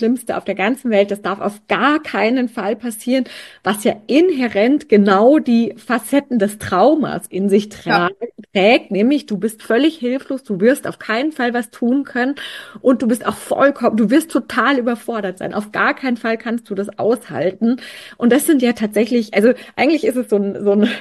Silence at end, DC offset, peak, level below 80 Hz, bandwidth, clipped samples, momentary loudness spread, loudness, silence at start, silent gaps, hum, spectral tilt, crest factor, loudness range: 0 s; under 0.1%; 0 dBFS; -60 dBFS; 12.5 kHz; under 0.1%; 9 LU; -17 LUFS; 0 s; none; none; -5 dB/octave; 16 dB; 4 LU